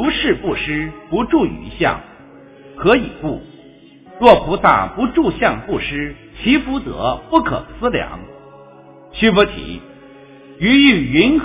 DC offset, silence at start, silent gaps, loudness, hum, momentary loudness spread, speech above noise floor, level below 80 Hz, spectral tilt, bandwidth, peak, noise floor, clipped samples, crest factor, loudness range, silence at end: under 0.1%; 0 s; none; -16 LUFS; none; 15 LU; 27 dB; -38 dBFS; -9.5 dB/octave; 4 kHz; 0 dBFS; -43 dBFS; 0.1%; 16 dB; 4 LU; 0 s